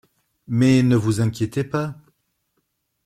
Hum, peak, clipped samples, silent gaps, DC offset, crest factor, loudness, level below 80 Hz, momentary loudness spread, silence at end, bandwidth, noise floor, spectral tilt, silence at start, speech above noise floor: none; -6 dBFS; under 0.1%; none; under 0.1%; 16 dB; -20 LUFS; -54 dBFS; 10 LU; 1.15 s; 14 kHz; -72 dBFS; -7 dB/octave; 0.5 s; 54 dB